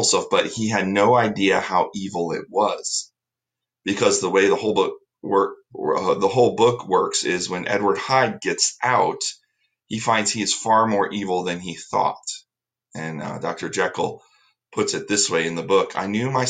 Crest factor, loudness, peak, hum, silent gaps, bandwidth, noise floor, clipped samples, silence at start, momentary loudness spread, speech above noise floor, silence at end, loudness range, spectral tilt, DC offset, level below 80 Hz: 18 dB; -21 LUFS; -4 dBFS; none; none; 9.6 kHz; -87 dBFS; under 0.1%; 0 s; 11 LU; 66 dB; 0 s; 5 LU; -3.5 dB/octave; under 0.1%; -64 dBFS